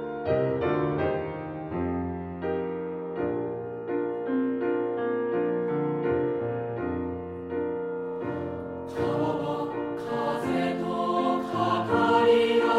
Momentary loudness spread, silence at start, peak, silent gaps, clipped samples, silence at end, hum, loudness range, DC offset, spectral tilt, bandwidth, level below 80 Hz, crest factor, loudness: 9 LU; 0 s; -10 dBFS; none; under 0.1%; 0 s; none; 4 LU; under 0.1%; -7.5 dB/octave; 11 kHz; -56 dBFS; 18 dB; -28 LUFS